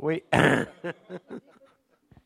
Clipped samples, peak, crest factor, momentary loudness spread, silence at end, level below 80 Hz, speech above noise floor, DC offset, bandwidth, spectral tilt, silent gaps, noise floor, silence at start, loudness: under 0.1%; -4 dBFS; 24 dB; 22 LU; 0.85 s; -56 dBFS; 37 dB; under 0.1%; 15 kHz; -6 dB/octave; none; -62 dBFS; 0 s; -24 LUFS